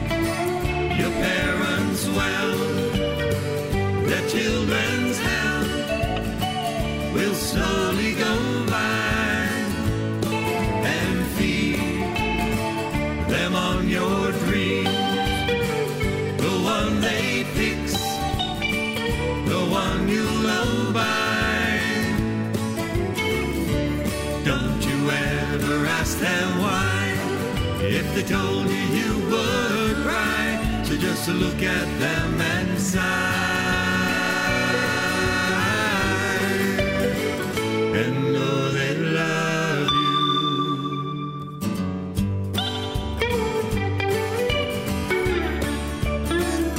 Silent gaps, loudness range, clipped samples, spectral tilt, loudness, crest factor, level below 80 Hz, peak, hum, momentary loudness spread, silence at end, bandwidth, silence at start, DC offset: none; 2 LU; under 0.1%; -5 dB/octave; -23 LUFS; 16 dB; -36 dBFS; -8 dBFS; none; 4 LU; 0 s; 16 kHz; 0 s; under 0.1%